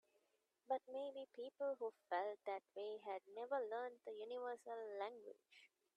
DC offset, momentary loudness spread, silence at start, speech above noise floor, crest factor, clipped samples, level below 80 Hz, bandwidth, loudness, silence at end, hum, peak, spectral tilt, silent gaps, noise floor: under 0.1%; 9 LU; 0.7 s; 36 dB; 20 dB; under 0.1%; under -90 dBFS; 11 kHz; -49 LUFS; 0.3 s; none; -30 dBFS; -3.5 dB/octave; none; -85 dBFS